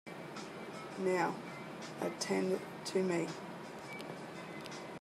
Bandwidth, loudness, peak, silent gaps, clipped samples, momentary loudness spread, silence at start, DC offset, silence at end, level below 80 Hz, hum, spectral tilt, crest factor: 14 kHz; -39 LUFS; -20 dBFS; none; under 0.1%; 12 LU; 0.05 s; under 0.1%; 0 s; -78 dBFS; none; -5 dB/octave; 20 dB